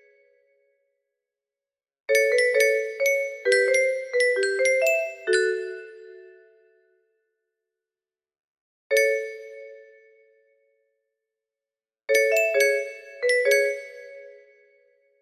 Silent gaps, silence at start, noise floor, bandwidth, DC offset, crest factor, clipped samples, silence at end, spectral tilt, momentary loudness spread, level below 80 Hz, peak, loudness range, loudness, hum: 8.40-8.55 s, 8.61-8.90 s; 2.1 s; under -90 dBFS; 14.5 kHz; under 0.1%; 18 dB; under 0.1%; 0.9 s; 0 dB/octave; 21 LU; -76 dBFS; -8 dBFS; 9 LU; -22 LUFS; none